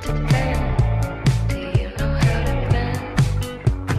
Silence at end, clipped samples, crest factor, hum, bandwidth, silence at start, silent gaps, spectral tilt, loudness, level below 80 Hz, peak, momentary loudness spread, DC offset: 0 s; under 0.1%; 12 dB; none; 14 kHz; 0 s; none; -6.5 dB/octave; -21 LUFS; -26 dBFS; -8 dBFS; 4 LU; under 0.1%